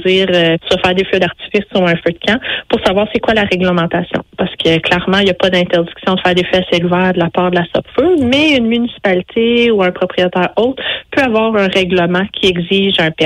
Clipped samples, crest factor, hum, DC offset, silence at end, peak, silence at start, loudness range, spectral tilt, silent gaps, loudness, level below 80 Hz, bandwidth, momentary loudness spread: under 0.1%; 12 dB; none; under 0.1%; 0 s; -2 dBFS; 0 s; 1 LU; -6 dB/octave; none; -13 LUFS; -42 dBFS; 11 kHz; 5 LU